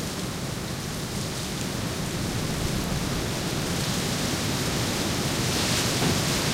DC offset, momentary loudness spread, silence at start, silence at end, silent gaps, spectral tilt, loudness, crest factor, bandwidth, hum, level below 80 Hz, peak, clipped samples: under 0.1%; 7 LU; 0 s; 0 s; none; -3.5 dB/octave; -27 LUFS; 14 dB; 16 kHz; none; -40 dBFS; -12 dBFS; under 0.1%